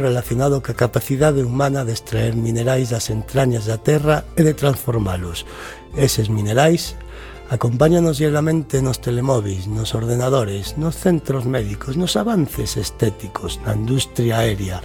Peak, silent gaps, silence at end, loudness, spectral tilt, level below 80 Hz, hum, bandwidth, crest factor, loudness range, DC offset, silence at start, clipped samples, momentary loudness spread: -2 dBFS; none; 0 s; -19 LUFS; -6 dB/octave; -36 dBFS; none; 17.5 kHz; 18 dB; 3 LU; under 0.1%; 0 s; under 0.1%; 8 LU